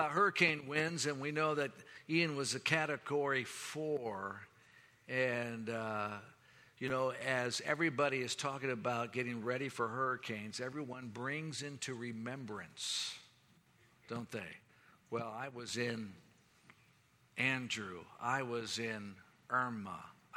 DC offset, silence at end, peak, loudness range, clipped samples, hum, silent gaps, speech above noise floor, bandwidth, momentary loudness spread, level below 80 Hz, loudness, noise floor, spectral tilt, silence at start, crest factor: under 0.1%; 0 s; -14 dBFS; 8 LU; under 0.1%; none; none; 31 dB; 16 kHz; 12 LU; -82 dBFS; -38 LUFS; -70 dBFS; -4 dB/octave; 0 s; 24 dB